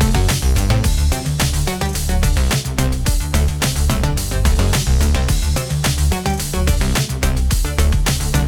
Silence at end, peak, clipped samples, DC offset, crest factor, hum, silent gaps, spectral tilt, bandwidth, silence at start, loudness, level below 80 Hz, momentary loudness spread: 0 s; -2 dBFS; under 0.1%; under 0.1%; 14 dB; none; none; -4.5 dB/octave; 19 kHz; 0 s; -18 LUFS; -18 dBFS; 3 LU